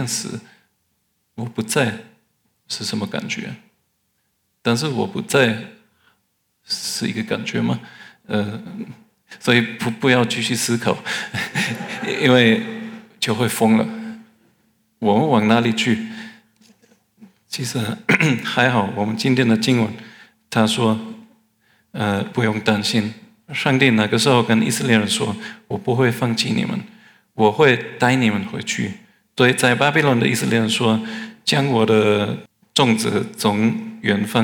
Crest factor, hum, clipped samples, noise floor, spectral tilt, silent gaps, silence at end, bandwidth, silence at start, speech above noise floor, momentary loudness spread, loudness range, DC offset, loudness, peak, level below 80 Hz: 20 dB; none; under 0.1%; -69 dBFS; -4.5 dB/octave; none; 0 s; 19 kHz; 0 s; 50 dB; 15 LU; 8 LU; under 0.1%; -19 LUFS; 0 dBFS; -68 dBFS